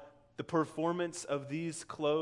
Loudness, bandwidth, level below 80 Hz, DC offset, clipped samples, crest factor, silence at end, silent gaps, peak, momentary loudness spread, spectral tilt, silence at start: -36 LUFS; 11.5 kHz; -76 dBFS; under 0.1%; under 0.1%; 18 dB; 0 s; none; -18 dBFS; 8 LU; -5 dB/octave; 0 s